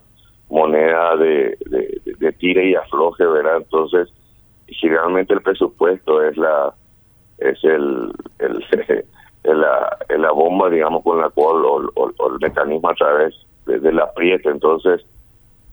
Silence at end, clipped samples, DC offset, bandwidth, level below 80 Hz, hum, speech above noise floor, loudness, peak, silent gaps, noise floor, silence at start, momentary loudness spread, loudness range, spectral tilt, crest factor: 0.75 s; under 0.1%; under 0.1%; over 20 kHz; -52 dBFS; none; 35 dB; -17 LUFS; 0 dBFS; none; -51 dBFS; 0.5 s; 8 LU; 3 LU; -7 dB/octave; 16 dB